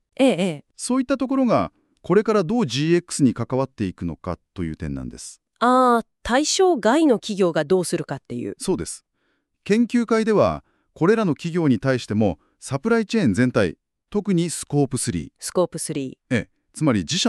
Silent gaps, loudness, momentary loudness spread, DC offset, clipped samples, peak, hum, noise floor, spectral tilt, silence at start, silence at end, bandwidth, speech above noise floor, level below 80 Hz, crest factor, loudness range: none; -21 LUFS; 13 LU; under 0.1%; under 0.1%; -4 dBFS; none; -70 dBFS; -5 dB/octave; 0.2 s; 0 s; 13 kHz; 50 dB; -48 dBFS; 16 dB; 4 LU